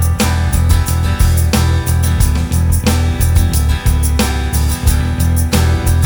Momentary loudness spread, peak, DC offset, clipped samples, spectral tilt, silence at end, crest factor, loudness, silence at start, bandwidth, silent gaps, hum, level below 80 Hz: 2 LU; 0 dBFS; under 0.1%; under 0.1%; -5 dB/octave; 0 s; 12 dB; -14 LUFS; 0 s; over 20 kHz; none; none; -16 dBFS